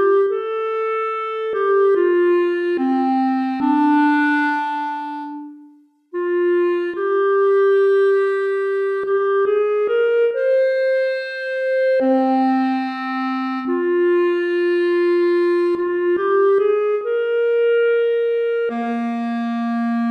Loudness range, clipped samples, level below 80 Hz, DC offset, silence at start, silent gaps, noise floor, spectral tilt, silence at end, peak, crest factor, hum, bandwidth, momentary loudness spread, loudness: 2 LU; under 0.1%; -70 dBFS; under 0.1%; 0 s; none; -49 dBFS; -6 dB/octave; 0 s; -6 dBFS; 12 dB; none; 5.6 kHz; 7 LU; -18 LUFS